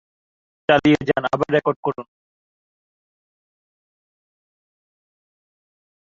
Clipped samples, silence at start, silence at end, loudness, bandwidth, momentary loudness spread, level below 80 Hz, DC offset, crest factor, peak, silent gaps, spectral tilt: under 0.1%; 0.7 s; 4.1 s; -19 LUFS; 7.4 kHz; 12 LU; -58 dBFS; under 0.1%; 24 dB; -2 dBFS; 1.76-1.83 s; -7 dB/octave